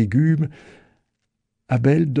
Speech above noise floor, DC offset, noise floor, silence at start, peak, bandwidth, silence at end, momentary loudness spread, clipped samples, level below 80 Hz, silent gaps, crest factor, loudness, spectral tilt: 58 dB; under 0.1%; -76 dBFS; 0 s; -6 dBFS; 7.8 kHz; 0 s; 8 LU; under 0.1%; -54 dBFS; none; 14 dB; -20 LUFS; -9.5 dB/octave